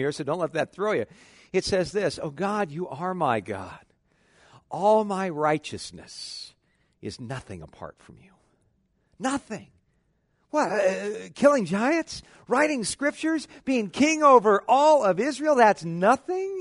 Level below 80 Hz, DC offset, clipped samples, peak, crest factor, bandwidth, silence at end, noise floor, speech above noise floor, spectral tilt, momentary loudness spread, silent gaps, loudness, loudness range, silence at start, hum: -60 dBFS; under 0.1%; under 0.1%; -4 dBFS; 22 dB; 11 kHz; 0 s; -70 dBFS; 45 dB; -5 dB/octave; 19 LU; none; -24 LUFS; 16 LU; 0 s; none